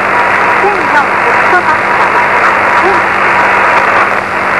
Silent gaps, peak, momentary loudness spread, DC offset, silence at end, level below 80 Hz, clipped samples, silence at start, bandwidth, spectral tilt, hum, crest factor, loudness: none; 0 dBFS; 2 LU; 0.5%; 0 s; -42 dBFS; 0.9%; 0 s; 12.5 kHz; -4 dB/octave; none; 8 dB; -7 LUFS